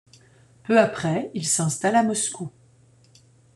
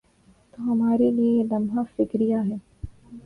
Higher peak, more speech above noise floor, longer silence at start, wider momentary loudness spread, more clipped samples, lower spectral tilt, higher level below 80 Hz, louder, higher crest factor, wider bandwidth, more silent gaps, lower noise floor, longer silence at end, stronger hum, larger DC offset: first, -4 dBFS vs -10 dBFS; about the same, 34 dB vs 36 dB; about the same, 0.7 s vs 0.6 s; second, 15 LU vs 18 LU; neither; second, -4 dB/octave vs -10 dB/octave; second, -66 dBFS vs -50 dBFS; about the same, -22 LUFS vs -23 LUFS; first, 20 dB vs 14 dB; first, 12.5 kHz vs 3.2 kHz; neither; about the same, -56 dBFS vs -58 dBFS; first, 1.05 s vs 0.05 s; neither; neither